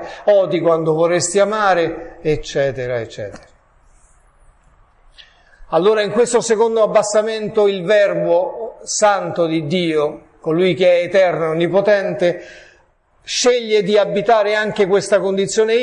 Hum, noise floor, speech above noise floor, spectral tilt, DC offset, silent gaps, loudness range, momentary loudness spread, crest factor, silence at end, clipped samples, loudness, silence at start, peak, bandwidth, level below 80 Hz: none; -55 dBFS; 39 dB; -4 dB/octave; under 0.1%; none; 8 LU; 8 LU; 14 dB; 0 s; under 0.1%; -16 LUFS; 0 s; -2 dBFS; 11 kHz; -50 dBFS